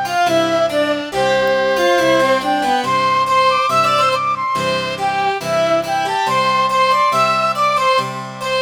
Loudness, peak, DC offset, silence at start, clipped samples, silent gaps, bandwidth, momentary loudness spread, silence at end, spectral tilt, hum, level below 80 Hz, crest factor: -15 LUFS; -4 dBFS; under 0.1%; 0 s; under 0.1%; none; over 20 kHz; 5 LU; 0 s; -3.5 dB/octave; none; -54 dBFS; 12 dB